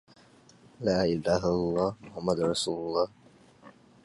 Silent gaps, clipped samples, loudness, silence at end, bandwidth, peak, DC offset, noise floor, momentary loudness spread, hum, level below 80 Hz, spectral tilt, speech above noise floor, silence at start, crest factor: none; under 0.1%; -29 LUFS; 0.35 s; 11.5 kHz; -12 dBFS; under 0.1%; -57 dBFS; 6 LU; none; -54 dBFS; -5.5 dB/octave; 29 dB; 0.8 s; 18 dB